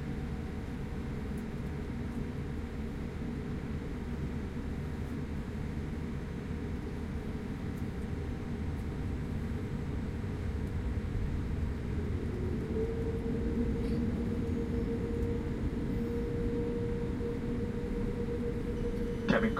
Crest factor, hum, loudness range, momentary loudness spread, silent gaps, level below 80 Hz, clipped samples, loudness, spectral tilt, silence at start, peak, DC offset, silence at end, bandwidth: 20 dB; none; 4 LU; 5 LU; none; -40 dBFS; under 0.1%; -36 LUFS; -8 dB/octave; 0 s; -14 dBFS; under 0.1%; 0 s; 14 kHz